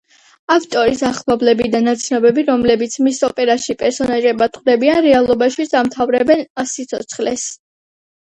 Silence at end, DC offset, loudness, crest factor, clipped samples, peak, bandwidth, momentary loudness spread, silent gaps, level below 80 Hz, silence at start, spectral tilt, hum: 0.7 s; under 0.1%; -15 LUFS; 14 dB; under 0.1%; 0 dBFS; 10 kHz; 9 LU; 6.50-6.55 s; -50 dBFS; 0.5 s; -3.5 dB/octave; none